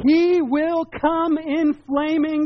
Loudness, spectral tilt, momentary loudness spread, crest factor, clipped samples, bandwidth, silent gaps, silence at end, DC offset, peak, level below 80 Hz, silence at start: -20 LUFS; -3.5 dB/octave; 5 LU; 12 dB; under 0.1%; 6.2 kHz; none; 0 s; under 0.1%; -6 dBFS; -52 dBFS; 0 s